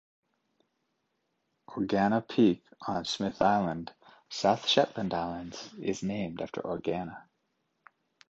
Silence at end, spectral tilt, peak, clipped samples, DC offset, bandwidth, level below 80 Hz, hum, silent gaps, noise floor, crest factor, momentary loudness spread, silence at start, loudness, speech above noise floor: 1.1 s; -5 dB/octave; -8 dBFS; under 0.1%; under 0.1%; 8.2 kHz; -64 dBFS; none; none; -79 dBFS; 24 dB; 15 LU; 1.7 s; -30 LUFS; 49 dB